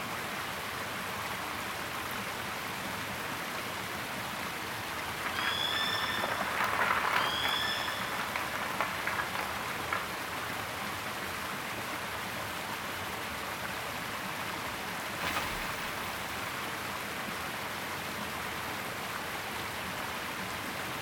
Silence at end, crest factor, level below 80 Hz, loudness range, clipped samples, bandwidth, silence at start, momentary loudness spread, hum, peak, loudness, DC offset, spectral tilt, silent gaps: 0 s; 22 dB; -58 dBFS; 6 LU; under 0.1%; over 20 kHz; 0 s; 7 LU; none; -14 dBFS; -34 LUFS; under 0.1%; -2.5 dB/octave; none